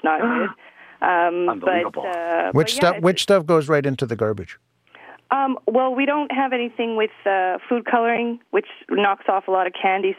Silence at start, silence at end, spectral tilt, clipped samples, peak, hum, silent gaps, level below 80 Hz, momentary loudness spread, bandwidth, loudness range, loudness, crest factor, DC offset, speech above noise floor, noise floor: 0.05 s; 0.05 s; -5 dB/octave; under 0.1%; -6 dBFS; none; none; -62 dBFS; 7 LU; 15.5 kHz; 3 LU; -20 LUFS; 16 dB; under 0.1%; 26 dB; -46 dBFS